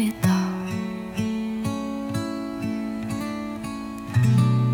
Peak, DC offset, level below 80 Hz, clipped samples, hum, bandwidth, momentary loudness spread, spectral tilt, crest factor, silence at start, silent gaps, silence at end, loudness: -8 dBFS; under 0.1%; -52 dBFS; under 0.1%; none; 18 kHz; 11 LU; -7 dB/octave; 16 dB; 0 s; none; 0 s; -26 LUFS